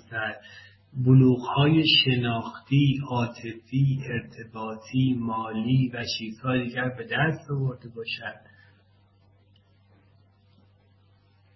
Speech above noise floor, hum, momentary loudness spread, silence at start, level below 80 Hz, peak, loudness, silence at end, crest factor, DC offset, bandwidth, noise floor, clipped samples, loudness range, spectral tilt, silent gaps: 35 dB; none; 17 LU; 0.1 s; -58 dBFS; -8 dBFS; -25 LUFS; 3.2 s; 18 dB; under 0.1%; 6 kHz; -60 dBFS; under 0.1%; 14 LU; -7 dB/octave; none